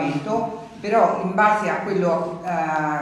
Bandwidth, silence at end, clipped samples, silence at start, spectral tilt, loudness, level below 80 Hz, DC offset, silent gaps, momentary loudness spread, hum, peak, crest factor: 12 kHz; 0 s; under 0.1%; 0 s; -6.5 dB/octave; -21 LUFS; -60 dBFS; under 0.1%; none; 7 LU; none; -4 dBFS; 16 dB